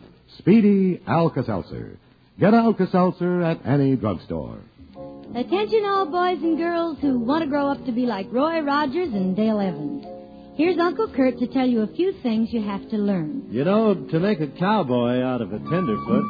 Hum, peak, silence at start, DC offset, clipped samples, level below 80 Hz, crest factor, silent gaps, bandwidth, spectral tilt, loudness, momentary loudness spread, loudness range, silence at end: none; -6 dBFS; 0 s; under 0.1%; under 0.1%; -54 dBFS; 16 dB; none; 5 kHz; -9.5 dB/octave; -22 LUFS; 12 LU; 2 LU; 0 s